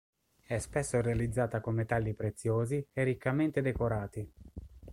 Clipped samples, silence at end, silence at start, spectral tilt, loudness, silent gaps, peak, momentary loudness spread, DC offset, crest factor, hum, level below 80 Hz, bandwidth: under 0.1%; 0 s; 0.5 s; -7 dB/octave; -33 LUFS; none; -16 dBFS; 12 LU; under 0.1%; 18 dB; none; -50 dBFS; 13 kHz